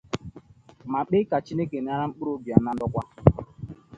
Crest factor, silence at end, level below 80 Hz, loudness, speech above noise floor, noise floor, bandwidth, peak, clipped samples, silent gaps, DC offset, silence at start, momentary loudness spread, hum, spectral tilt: 26 dB; 0.25 s; -44 dBFS; -26 LUFS; 25 dB; -50 dBFS; 7.8 kHz; 0 dBFS; under 0.1%; none; under 0.1%; 0.15 s; 17 LU; none; -9 dB/octave